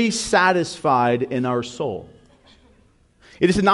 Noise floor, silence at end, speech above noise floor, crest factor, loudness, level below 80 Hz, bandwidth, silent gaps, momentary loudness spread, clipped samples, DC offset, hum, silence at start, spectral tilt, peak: -57 dBFS; 0 s; 37 dB; 18 dB; -20 LUFS; -50 dBFS; 11.5 kHz; none; 11 LU; under 0.1%; under 0.1%; none; 0 s; -4.5 dB/octave; -4 dBFS